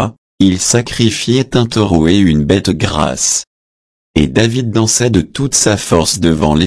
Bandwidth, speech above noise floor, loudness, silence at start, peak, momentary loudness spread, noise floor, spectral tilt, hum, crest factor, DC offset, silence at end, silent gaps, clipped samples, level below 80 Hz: 11 kHz; over 78 dB; -12 LUFS; 0 s; 0 dBFS; 4 LU; under -90 dBFS; -4.5 dB/octave; none; 12 dB; under 0.1%; 0 s; 0.18-0.38 s, 3.47-4.14 s; under 0.1%; -32 dBFS